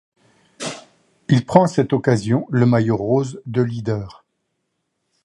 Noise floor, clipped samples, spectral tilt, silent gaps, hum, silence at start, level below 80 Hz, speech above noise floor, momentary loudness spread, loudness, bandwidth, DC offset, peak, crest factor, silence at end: -73 dBFS; under 0.1%; -7.5 dB/octave; none; none; 0.6 s; -54 dBFS; 56 dB; 15 LU; -19 LUFS; 11.5 kHz; under 0.1%; 0 dBFS; 20 dB; 1.15 s